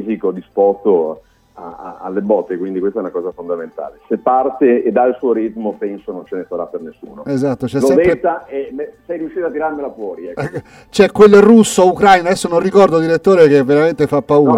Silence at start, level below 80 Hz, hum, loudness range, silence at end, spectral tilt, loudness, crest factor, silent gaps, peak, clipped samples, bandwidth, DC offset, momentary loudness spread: 0 s; -48 dBFS; none; 9 LU; 0 s; -6 dB/octave; -14 LUFS; 14 dB; none; 0 dBFS; under 0.1%; 15 kHz; under 0.1%; 17 LU